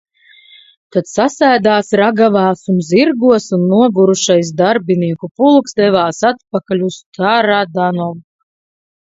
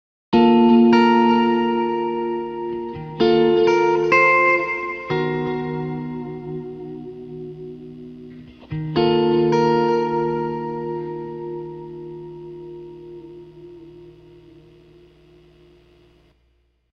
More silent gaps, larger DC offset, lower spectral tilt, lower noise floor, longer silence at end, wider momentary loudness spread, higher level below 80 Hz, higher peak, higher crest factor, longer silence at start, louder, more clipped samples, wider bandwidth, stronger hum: first, 5.31-5.35 s, 7.06-7.12 s vs none; neither; second, -5.5 dB/octave vs -7 dB/octave; second, -45 dBFS vs -63 dBFS; second, 0.95 s vs 2.8 s; second, 8 LU vs 23 LU; about the same, -58 dBFS vs -54 dBFS; first, 0 dBFS vs -4 dBFS; about the same, 14 dB vs 18 dB; first, 0.95 s vs 0.3 s; first, -13 LUFS vs -18 LUFS; neither; first, 8 kHz vs 6.4 kHz; neither